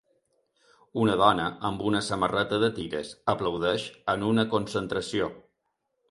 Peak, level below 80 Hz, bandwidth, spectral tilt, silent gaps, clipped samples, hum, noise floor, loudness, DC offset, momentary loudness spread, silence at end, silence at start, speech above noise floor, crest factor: -6 dBFS; -56 dBFS; 11.5 kHz; -5.5 dB/octave; none; under 0.1%; none; -78 dBFS; -27 LUFS; under 0.1%; 8 LU; 0.7 s; 0.95 s; 52 dB; 22 dB